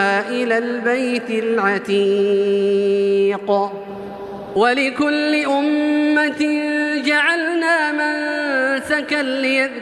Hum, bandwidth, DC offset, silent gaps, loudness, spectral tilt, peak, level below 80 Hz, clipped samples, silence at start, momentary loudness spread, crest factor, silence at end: none; 12 kHz; under 0.1%; none; -18 LUFS; -4.5 dB/octave; -4 dBFS; -62 dBFS; under 0.1%; 0 s; 4 LU; 14 dB; 0 s